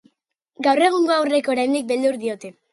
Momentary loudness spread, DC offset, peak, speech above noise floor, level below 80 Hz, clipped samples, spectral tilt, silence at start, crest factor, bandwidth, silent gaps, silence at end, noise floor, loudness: 10 LU; under 0.1%; -2 dBFS; 51 dB; -72 dBFS; under 0.1%; -3.5 dB/octave; 0.6 s; 18 dB; 11.5 kHz; none; 0.2 s; -71 dBFS; -20 LUFS